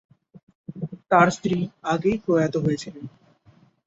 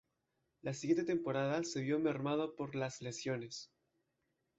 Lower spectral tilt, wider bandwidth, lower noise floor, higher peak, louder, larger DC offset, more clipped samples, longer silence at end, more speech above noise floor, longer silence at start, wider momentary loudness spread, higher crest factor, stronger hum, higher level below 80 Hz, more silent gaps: about the same, -6.5 dB/octave vs -5.5 dB/octave; about the same, 8 kHz vs 8.2 kHz; second, -57 dBFS vs -84 dBFS; first, -4 dBFS vs -22 dBFS; first, -22 LUFS vs -38 LUFS; neither; neither; second, 0.8 s vs 0.95 s; second, 35 dB vs 47 dB; about the same, 0.7 s vs 0.65 s; first, 23 LU vs 11 LU; about the same, 22 dB vs 18 dB; neither; first, -58 dBFS vs -78 dBFS; neither